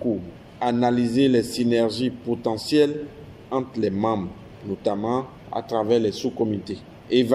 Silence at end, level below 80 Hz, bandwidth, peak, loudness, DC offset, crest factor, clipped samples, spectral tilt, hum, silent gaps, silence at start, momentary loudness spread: 0 s; -56 dBFS; 14.5 kHz; -6 dBFS; -24 LUFS; under 0.1%; 18 dB; under 0.1%; -6 dB/octave; none; none; 0 s; 14 LU